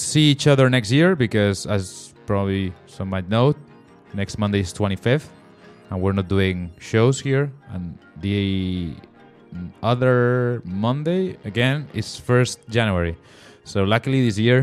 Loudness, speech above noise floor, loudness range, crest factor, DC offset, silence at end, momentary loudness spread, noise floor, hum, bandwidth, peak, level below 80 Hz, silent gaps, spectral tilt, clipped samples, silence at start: -21 LUFS; 27 dB; 4 LU; 18 dB; under 0.1%; 0 s; 16 LU; -47 dBFS; none; 12.5 kHz; -2 dBFS; -48 dBFS; none; -6 dB/octave; under 0.1%; 0 s